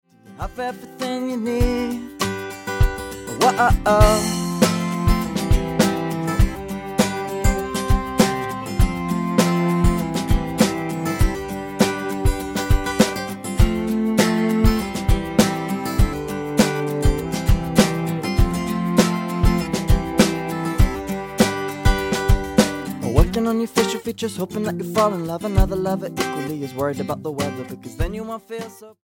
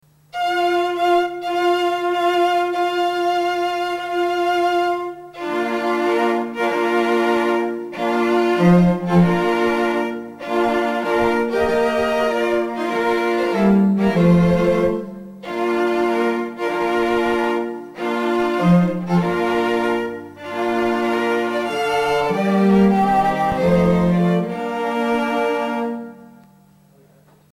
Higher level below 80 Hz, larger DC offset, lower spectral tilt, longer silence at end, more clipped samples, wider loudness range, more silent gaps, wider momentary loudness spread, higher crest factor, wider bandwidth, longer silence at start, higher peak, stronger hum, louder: first, -26 dBFS vs -46 dBFS; neither; second, -5.5 dB/octave vs -7 dB/octave; second, 0.15 s vs 1.3 s; neither; about the same, 4 LU vs 3 LU; neither; about the same, 9 LU vs 9 LU; about the same, 18 dB vs 16 dB; first, 17 kHz vs 14.5 kHz; about the same, 0.25 s vs 0.35 s; about the same, 0 dBFS vs -2 dBFS; neither; about the same, -21 LUFS vs -19 LUFS